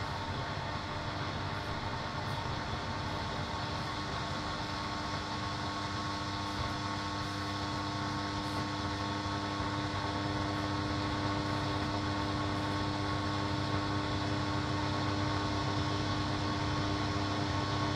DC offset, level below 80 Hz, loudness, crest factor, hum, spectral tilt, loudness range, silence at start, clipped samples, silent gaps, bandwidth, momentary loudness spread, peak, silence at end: under 0.1%; -50 dBFS; -35 LUFS; 16 dB; none; -5 dB/octave; 3 LU; 0 s; under 0.1%; none; 12.5 kHz; 4 LU; -18 dBFS; 0 s